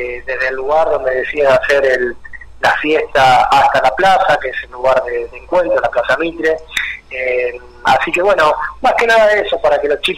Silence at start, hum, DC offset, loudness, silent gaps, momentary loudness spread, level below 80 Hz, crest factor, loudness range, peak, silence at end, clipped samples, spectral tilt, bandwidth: 0 s; none; under 0.1%; -13 LUFS; none; 9 LU; -40 dBFS; 10 dB; 4 LU; -4 dBFS; 0 s; under 0.1%; -3.5 dB/octave; 15.5 kHz